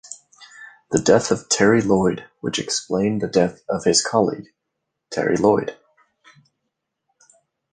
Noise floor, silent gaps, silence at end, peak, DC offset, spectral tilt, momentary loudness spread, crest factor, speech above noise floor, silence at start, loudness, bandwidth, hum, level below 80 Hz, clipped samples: -79 dBFS; none; 2 s; -2 dBFS; under 0.1%; -4 dB/octave; 16 LU; 20 dB; 60 dB; 0.1 s; -20 LUFS; 10 kHz; none; -54 dBFS; under 0.1%